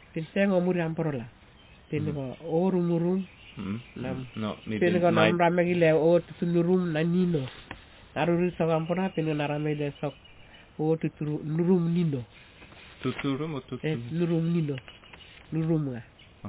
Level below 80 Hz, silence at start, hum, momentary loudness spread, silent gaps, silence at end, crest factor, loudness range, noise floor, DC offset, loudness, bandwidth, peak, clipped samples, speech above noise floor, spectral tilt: -58 dBFS; 0.15 s; none; 15 LU; none; 0 s; 20 dB; 6 LU; -54 dBFS; under 0.1%; -27 LUFS; 4 kHz; -8 dBFS; under 0.1%; 27 dB; -11.5 dB/octave